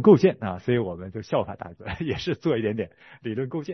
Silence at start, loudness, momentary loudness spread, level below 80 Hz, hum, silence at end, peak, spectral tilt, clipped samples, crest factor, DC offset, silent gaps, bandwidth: 0 s; -26 LUFS; 14 LU; -56 dBFS; none; 0 s; -4 dBFS; -8 dB/octave; under 0.1%; 20 dB; under 0.1%; none; 6.4 kHz